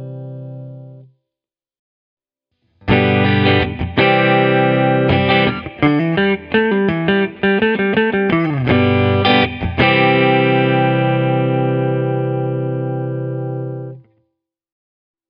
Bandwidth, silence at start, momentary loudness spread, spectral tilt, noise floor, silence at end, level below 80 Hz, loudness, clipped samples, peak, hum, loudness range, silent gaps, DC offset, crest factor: 5.4 kHz; 0 s; 11 LU; -9.5 dB/octave; -87 dBFS; 1.3 s; -40 dBFS; -15 LUFS; under 0.1%; 0 dBFS; none; 7 LU; 1.79-2.17 s; under 0.1%; 16 dB